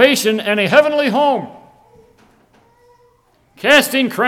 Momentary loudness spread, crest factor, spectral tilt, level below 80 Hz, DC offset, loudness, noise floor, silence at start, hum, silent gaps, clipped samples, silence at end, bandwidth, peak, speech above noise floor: 10 LU; 16 dB; -3.5 dB/octave; -60 dBFS; under 0.1%; -14 LUFS; -56 dBFS; 0 s; none; none; under 0.1%; 0 s; 17.5 kHz; 0 dBFS; 42 dB